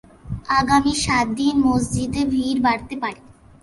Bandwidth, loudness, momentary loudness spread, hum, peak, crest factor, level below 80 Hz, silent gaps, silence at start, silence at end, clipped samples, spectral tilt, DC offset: 11.5 kHz; -20 LUFS; 11 LU; none; -4 dBFS; 16 dB; -40 dBFS; none; 0.25 s; 0.45 s; under 0.1%; -4.5 dB/octave; under 0.1%